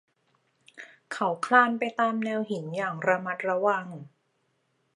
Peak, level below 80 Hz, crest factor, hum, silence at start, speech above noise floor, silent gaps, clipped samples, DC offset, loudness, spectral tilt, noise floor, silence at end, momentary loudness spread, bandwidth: -6 dBFS; -84 dBFS; 24 dB; none; 0.75 s; 47 dB; none; under 0.1%; under 0.1%; -26 LUFS; -5.5 dB/octave; -73 dBFS; 0.9 s; 23 LU; 11.5 kHz